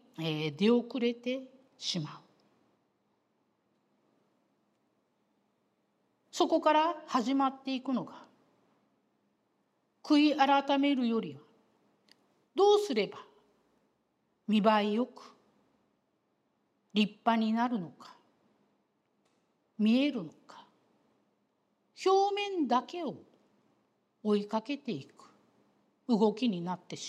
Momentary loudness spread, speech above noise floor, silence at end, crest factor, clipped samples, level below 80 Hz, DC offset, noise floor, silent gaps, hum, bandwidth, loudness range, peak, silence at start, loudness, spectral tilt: 14 LU; 47 dB; 0 s; 22 dB; under 0.1%; under -90 dBFS; under 0.1%; -77 dBFS; none; none; 12 kHz; 6 LU; -12 dBFS; 0.2 s; -30 LUFS; -5.5 dB/octave